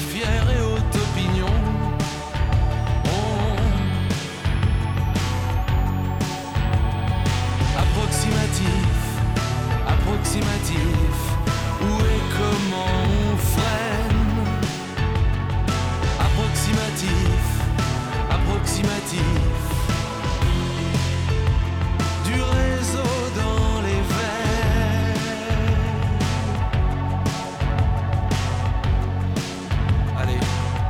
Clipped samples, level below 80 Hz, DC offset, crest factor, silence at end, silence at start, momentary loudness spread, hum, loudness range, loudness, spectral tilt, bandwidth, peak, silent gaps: under 0.1%; -26 dBFS; under 0.1%; 10 dB; 0 s; 0 s; 3 LU; none; 1 LU; -22 LUFS; -5.5 dB/octave; 18 kHz; -10 dBFS; none